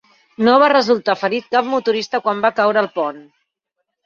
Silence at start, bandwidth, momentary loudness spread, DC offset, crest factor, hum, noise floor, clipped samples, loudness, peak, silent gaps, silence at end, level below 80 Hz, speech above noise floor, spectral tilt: 0.4 s; 7.4 kHz; 8 LU; under 0.1%; 16 dB; none; -76 dBFS; under 0.1%; -16 LUFS; -2 dBFS; none; 0.85 s; -66 dBFS; 60 dB; -5 dB/octave